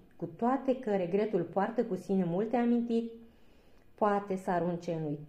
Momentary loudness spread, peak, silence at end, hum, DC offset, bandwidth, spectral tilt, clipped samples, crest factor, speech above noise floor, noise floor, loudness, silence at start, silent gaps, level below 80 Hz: 5 LU; -16 dBFS; 0 s; none; under 0.1%; 9.8 kHz; -8.5 dB/octave; under 0.1%; 16 dB; 27 dB; -58 dBFS; -32 LUFS; 0.15 s; none; -68 dBFS